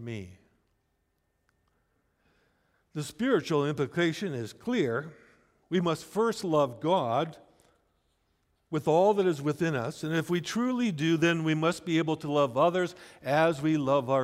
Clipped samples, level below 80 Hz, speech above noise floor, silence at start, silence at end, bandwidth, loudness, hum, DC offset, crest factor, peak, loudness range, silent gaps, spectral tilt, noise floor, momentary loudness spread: under 0.1%; -68 dBFS; 48 dB; 0 s; 0 s; 15.5 kHz; -28 LUFS; none; under 0.1%; 18 dB; -12 dBFS; 5 LU; none; -6 dB/octave; -76 dBFS; 10 LU